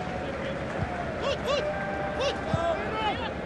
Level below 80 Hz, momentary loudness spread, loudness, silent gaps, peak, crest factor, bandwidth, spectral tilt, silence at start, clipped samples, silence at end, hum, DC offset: -46 dBFS; 5 LU; -30 LUFS; none; -14 dBFS; 16 dB; 12 kHz; -5.5 dB/octave; 0 s; under 0.1%; 0 s; none; under 0.1%